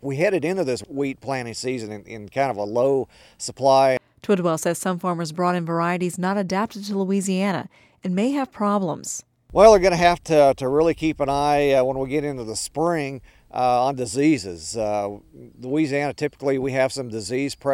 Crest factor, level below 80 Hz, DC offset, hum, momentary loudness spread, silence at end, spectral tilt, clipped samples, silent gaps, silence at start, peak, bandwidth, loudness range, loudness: 22 dB; -48 dBFS; under 0.1%; none; 13 LU; 0 s; -5.5 dB/octave; under 0.1%; none; 0.05 s; 0 dBFS; 16 kHz; 6 LU; -22 LUFS